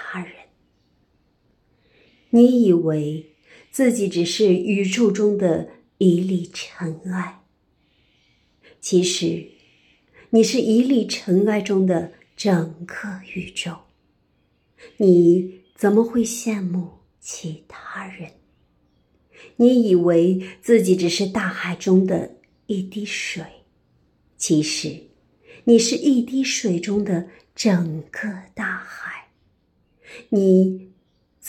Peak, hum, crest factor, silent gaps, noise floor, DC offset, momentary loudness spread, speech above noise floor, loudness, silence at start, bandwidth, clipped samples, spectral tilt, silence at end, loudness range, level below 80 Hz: -2 dBFS; none; 18 dB; none; -64 dBFS; under 0.1%; 18 LU; 45 dB; -20 LUFS; 0 s; 14 kHz; under 0.1%; -5.5 dB/octave; 0 s; 7 LU; -64 dBFS